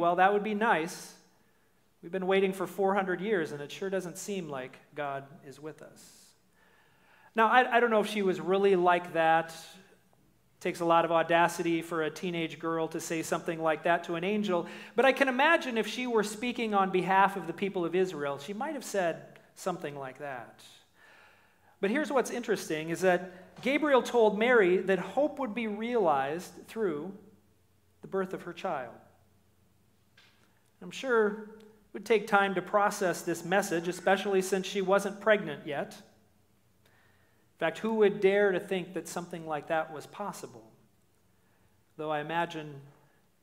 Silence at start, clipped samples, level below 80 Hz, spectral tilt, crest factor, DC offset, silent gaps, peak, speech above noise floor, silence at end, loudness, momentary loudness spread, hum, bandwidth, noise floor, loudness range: 0 s; under 0.1%; -80 dBFS; -4.5 dB/octave; 22 dB; under 0.1%; none; -8 dBFS; 40 dB; 0.55 s; -29 LUFS; 16 LU; none; 16 kHz; -70 dBFS; 11 LU